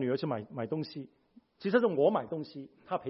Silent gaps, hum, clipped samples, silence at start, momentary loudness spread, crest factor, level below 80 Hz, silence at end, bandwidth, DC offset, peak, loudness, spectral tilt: none; none; under 0.1%; 0 s; 18 LU; 20 dB; -76 dBFS; 0 s; 5.8 kHz; under 0.1%; -12 dBFS; -32 LUFS; -10 dB/octave